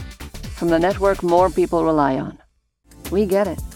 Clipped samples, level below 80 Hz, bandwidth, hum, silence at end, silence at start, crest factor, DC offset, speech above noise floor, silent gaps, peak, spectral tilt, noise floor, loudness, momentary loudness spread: under 0.1%; -38 dBFS; 17.5 kHz; none; 0 s; 0 s; 16 dB; under 0.1%; 40 dB; none; -4 dBFS; -6.5 dB/octave; -58 dBFS; -19 LUFS; 17 LU